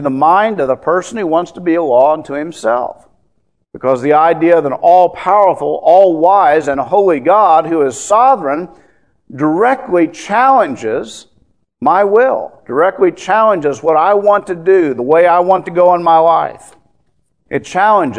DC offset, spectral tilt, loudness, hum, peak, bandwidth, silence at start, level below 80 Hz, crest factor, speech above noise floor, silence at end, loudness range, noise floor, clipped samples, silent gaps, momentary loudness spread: 0.2%; -5.5 dB/octave; -11 LUFS; none; 0 dBFS; 10.5 kHz; 0 s; -56 dBFS; 12 dB; 51 dB; 0 s; 4 LU; -62 dBFS; 0.2%; none; 9 LU